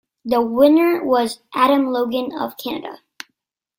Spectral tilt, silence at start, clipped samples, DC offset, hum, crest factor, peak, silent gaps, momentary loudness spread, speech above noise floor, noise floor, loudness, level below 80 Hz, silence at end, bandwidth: -4.5 dB/octave; 0.25 s; under 0.1%; under 0.1%; none; 16 dB; -2 dBFS; none; 23 LU; 58 dB; -75 dBFS; -18 LUFS; -62 dBFS; 0.85 s; 17 kHz